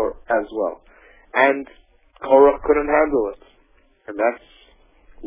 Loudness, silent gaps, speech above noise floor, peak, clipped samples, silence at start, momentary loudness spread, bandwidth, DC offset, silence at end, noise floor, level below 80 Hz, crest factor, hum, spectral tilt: -19 LUFS; none; 38 dB; 0 dBFS; under 0.1%; 0 s; 19 LU; 3.7 kHz; under 0.1%; 0 s; -57 dBFS; -48 dBFS; 20 dB; none; -8.5 dB/octave